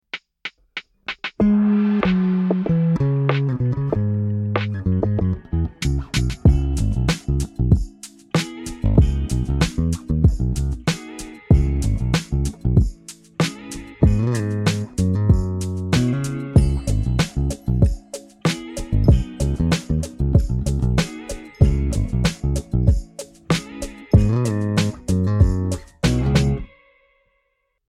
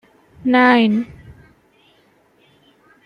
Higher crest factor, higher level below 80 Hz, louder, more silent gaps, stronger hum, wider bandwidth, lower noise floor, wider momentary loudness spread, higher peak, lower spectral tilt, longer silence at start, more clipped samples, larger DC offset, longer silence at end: about the same, 18 dB vs 18 dB; first, -26 dBFS vs -56 dBFS; second, -21 LUFS vs -15 LUFS; neither; neither; first, 14 kHz vs 5.2 kHz; first, -71 dBFS vs -56 dBFS; second, 11 LU vs 14 LU; about the same, 0 dBFS vs -2 dBFS; about the same, -6.5 dB/octave vs -7 dB/octave; second, 0.15 s vs 0.45 s; neither; neither; second, 1.2 s vs 2 s